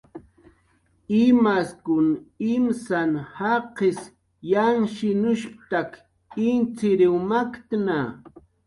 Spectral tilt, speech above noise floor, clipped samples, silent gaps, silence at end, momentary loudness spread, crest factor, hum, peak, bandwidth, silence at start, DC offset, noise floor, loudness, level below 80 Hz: -7 dB/octave; 42 dB; under 0.1%; none; 0.4 s; 9 LU; 16 dB; none; -8 dBFS; 11.5 kHz; 0.15 s; under 0.1%; -64 dBFS; -23 LUFS; -62 dBFS